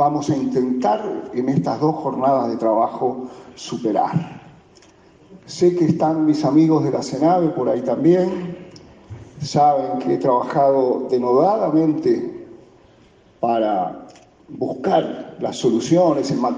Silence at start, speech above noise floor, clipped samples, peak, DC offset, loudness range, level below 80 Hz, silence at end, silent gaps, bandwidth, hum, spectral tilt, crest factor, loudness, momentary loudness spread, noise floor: 0 s; 33 dB; under 0.1%; -4 dBFS; under 0.1%; 5 LU; -60 dBFS; 0 s; none; 9.4 kHz; none; -7 dB/octave; 16 dB; -19 LUFS; 14 LU; -51 dBFS